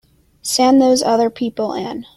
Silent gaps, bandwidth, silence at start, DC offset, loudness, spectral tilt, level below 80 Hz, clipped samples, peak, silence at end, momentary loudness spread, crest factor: none; 16 kHz; 0.45 s; under 0.1%; -16 LUFS; -3.5 dB/octave; -56 dBFS; under 0.1%; -2 dBFS; 0.15 s; 12 LU; 14 dB